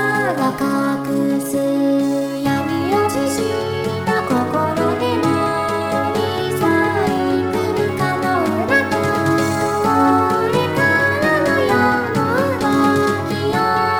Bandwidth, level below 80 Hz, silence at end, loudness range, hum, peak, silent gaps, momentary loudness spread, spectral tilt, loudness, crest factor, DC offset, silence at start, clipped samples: over 20 kHz; -50 dBFS; 0 s; 3 LU; none; -2 dBFS; none; 4 LU; -5.5 dB/octave; -17 LUFS; 14 dB; under 0.1%; 0 s; under 0.1%